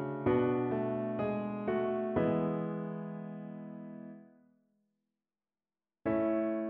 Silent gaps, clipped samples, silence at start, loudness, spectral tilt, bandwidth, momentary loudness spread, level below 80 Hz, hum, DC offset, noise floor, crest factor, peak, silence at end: none; under 0.1%; 0 s; -34 LUFS; -8 dB/octave; 4.1 kHz; 15 LU; -64 dBFS; none; under 0.1%; under -90 dBFS; 18 dB; -18 dBFS; 0 s